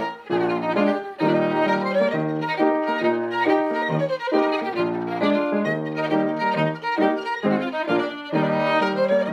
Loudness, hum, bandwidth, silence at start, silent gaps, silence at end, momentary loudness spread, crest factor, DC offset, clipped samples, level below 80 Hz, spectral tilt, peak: -22 LUFS; none; 10.5 kHz; 0 s; none; 0 s; 4 LU; 14 dB; under 0.1%; under 0.1%; -72 dBFS; -7 dB/octave; -8 dBFS